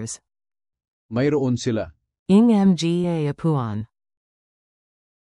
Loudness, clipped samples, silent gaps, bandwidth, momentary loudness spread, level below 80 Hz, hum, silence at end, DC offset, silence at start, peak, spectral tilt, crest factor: -20 LUFS; under 0.1%; 0.88-1.09 s, 2.19-2.26 s; 11.5 kHz; 19 LU; -56 dBFS; none; 1.45 s; under 0.1%; 0 s; -6 dBFS; -7 dB/octave; 16 dB